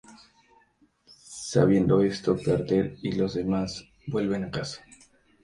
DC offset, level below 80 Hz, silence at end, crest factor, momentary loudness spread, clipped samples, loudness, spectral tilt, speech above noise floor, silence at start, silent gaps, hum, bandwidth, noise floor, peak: under 0.1%; -52 dBFS; 0.65 s; 20 dB; 16 LU; under 0.1%; -26 LUFS; -6.5 dB/octave; 39 dB; 0.1 s; none; none; 11 kHz; -64 dBFS; -6 dBFS